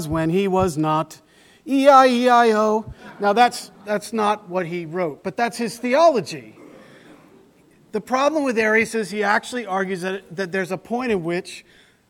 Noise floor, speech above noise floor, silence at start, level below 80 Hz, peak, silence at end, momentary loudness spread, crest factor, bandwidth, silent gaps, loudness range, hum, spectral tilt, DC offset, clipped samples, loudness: -54 dBFS; 34 dB; 0 s; -52 dBFS; 0 dBFS; 0.5 s; 13 LU; 20 dB; 17.5 kHz; none; 6 LU; none; -5 dB/octave; under 0.1%; under 0.1%; -20 LUFS